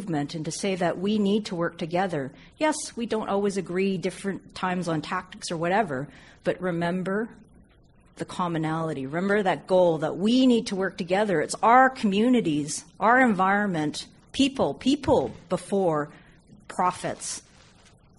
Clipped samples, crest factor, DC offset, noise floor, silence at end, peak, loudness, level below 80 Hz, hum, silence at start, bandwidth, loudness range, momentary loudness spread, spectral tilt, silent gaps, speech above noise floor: under 0.1%; 20 dB; under 0.1%; -57 dBFS; 0.8 s; -6 dBFS; -25 LUFS; -58 dBFS; none; 0 s; 11.5 kHz; 7 LU; 12 LU; -5 dB/octave; none; 32 dB